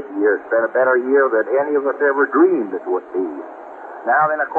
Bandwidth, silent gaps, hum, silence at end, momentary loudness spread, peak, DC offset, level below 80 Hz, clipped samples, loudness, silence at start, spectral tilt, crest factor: 3 kHz; none; none; 0 s; 13 LU; -4 dBFS; under 0.1%; -72 dBFS; under 0.1%; -17 LUFS; 0 s; -9 dB/octave; 14 dB